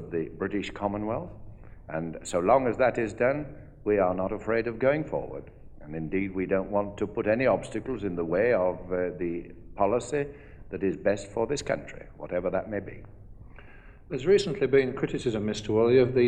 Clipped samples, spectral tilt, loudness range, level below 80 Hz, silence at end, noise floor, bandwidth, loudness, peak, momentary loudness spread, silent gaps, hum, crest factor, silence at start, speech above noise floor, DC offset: under 0.1%; -6.5 dB/octave; 5 LU; -50 dBFS; 0 s; -48 dBFS; 10 kHz; -28 LUFS; -8 dBFS; 14 LU; none; none; 20 dB; 0 s; 21 dB; under 0.1%